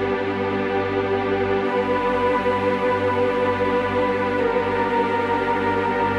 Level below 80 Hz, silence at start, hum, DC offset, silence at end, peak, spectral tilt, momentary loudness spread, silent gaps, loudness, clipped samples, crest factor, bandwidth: -48 dBFS; 0 s; 50 Hz at -50 dBFS; under 0.1%; 0 s; -8 dBFS; -7 dB/octave; 2 LU; none; -21 LUFS; under 0.1%; 14 dB; 9.2 kHz